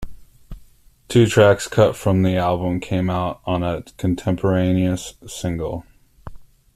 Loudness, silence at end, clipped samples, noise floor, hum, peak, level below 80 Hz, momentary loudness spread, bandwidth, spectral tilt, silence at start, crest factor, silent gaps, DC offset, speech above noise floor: -19 LUFS; 0.35 s; under 0.1%; -49 dBFS; none; -2 dBFS; -42 dBFS; 12 LU; 14.5 kHz; -6.5 dB/octave; 0 s; 18 dB; none; under 0.1%; 31 dB